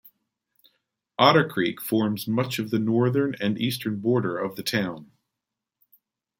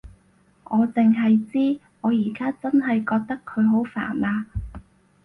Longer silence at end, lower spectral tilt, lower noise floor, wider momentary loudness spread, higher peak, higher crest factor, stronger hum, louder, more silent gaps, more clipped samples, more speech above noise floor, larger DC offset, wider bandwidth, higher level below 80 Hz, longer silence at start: first, 1.35 s vs 0.45 s; second, -5.5 dB/octave vs -9 dB/octave; first, -86 dBFS vs -59 dBFS; about the same, 10 LU vs 9 LU; first, -2 dBFS vs -10 dBFS; first, 24 dB vs 14 dB; neither; about the same, -24 LUFS vs -22 LUFS; neither; neither; first, 62 dB vs 38 dB; neither; first, 17 kHz vs 3.8 kHz; second, -68 dBFS vs -46 dBFS; first, 1.2 s vs 0.05 s